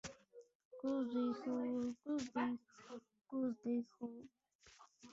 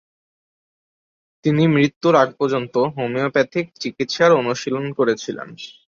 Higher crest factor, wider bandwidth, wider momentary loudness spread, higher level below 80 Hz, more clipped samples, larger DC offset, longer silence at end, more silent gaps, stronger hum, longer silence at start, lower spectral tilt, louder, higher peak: about the same, 16 dB vs 18 dB; about the same, 7.8 kHz vs 7.6 kHz; first, 21 LU vs 12 LU; second, -80 dBFS vs -62 dBFS; neither; neither; second, 0 s vs 0.25 s; first, 0.55-0.71 s, 4.55-4.59 s vs 1.96-2.01 s; neither; second, 0.05 s vs 1.45 s; about the same, -5 dB/octave vs -6 dB/octave; second, -43 LUFS vs -19 LUFS; second, -28 dBFS vs -2 dBFS